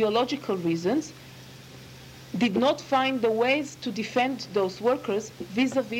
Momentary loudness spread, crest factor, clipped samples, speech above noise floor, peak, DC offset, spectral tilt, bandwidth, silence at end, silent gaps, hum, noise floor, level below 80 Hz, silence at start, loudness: 22 LU; 16 dB; under 0.1%; 20 dB; -10 dBFS; under 0.1%; -5 dB/octave; 16.5 kHz; 0 s; none; none; -46 dBFS; -62 dBFS; 0 s; -26 LUFS